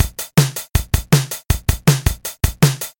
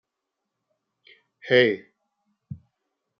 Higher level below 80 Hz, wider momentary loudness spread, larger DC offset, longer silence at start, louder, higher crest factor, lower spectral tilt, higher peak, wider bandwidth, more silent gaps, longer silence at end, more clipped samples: first, -26 dBFS vs -72 dBFS; second, 6 LU vs 24 LU; neither; second, 0 s vs 1.45 s; first, -18 LUFS vs -21 LUFS; second, 16 dB vs 24 dB; first, -4.5 dB/octave vs -3 dB/octave; first, 0 dBFS vs -4 dBFS; first, 17 kHz vs 6.4 kHz; neither; second, 0.1 s vs 0.65 s; neither